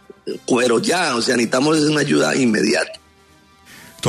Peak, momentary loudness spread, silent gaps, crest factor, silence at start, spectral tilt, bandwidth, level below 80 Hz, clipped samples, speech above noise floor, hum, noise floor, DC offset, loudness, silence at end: -4 dBFS; 6 LU; none; 14 dB; 0.25 s; -4 dB/octave; 13.5 kHz; -60 dBFS; under 0.1%; 34 dB; none; -51 dBFS; under 0.1%; -17 LUFS; 0 s